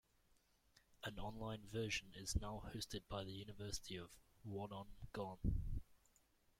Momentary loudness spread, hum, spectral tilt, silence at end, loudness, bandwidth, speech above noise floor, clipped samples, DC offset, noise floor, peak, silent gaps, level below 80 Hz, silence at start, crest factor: 9 LU; none; -4.5 dB/octave; 0.65 s; -49 LUFS; 16.5 kHz; 30 dB; under 0.1%; under 0.1%; -77 dBFS; -28 dBFS; none; -54 dBFS; 0.9 s; 22 dB